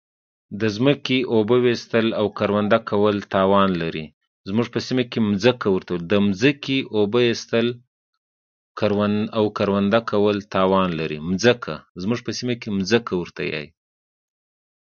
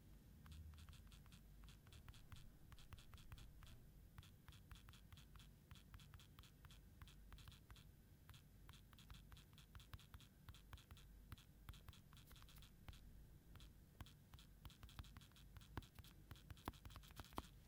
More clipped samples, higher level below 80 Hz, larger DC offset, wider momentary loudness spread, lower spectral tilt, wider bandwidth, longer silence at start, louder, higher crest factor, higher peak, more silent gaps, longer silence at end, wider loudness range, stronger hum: neither; first, -52 dBFS vs -66 dBFS; neither; about the same, 9 LU vs 7 LU; first, -6 dB/octave vs -4.5 dB/octave; second, 7.2 kHz vs 18 kHz; first, 0.5 s vs 0 s; first, -21 LUFS vs -64 LUFS; second, 20 dB vs 32 dB; first, 0 dBFS vs -30 dBFS; first, 4.14-4.21 s, 4.27-4.44 s, 7.87-8.75 s, 11.89-11.95 s vs none; first, 1.3 s vs 0 s; about the same, 3 LU vs 4 LU; neither